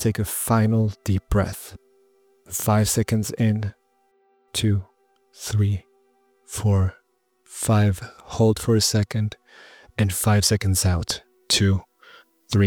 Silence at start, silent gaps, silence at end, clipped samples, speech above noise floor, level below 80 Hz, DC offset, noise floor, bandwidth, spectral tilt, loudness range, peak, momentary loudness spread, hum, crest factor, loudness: 0 s; none; 0 s; under 0.1%; 44 dB; -44 dBFS; under 0.1%; -65 dBFS; 19.5 kHz; -5 dB/octave; 4 LU; -6 dBFS; 12 LU; none; 18 dB; -22 LUFS